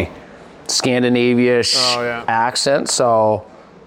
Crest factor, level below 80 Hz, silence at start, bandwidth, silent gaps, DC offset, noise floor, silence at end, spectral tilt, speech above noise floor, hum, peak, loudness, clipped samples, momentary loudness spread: 14 dB; -50 dBFS; 0 s; 16.5 kHz; none; under 0.1%; -39 dBFS; 0.4 s; -3 dB/octave; 24 dB; none; -2 dBFS; -15 LUFS; under 0.1%; 6 LU